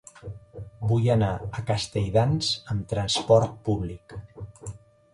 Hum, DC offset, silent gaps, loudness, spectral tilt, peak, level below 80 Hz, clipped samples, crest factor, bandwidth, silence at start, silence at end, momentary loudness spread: none; under 0.1%; none; -25 LUFS; -5.5 dB/octave; -6 dBFS; -46 dBFS; under 0.1%; 20 dB; 11.5 kHz; 0.25 s; 0.35 s; 21 LU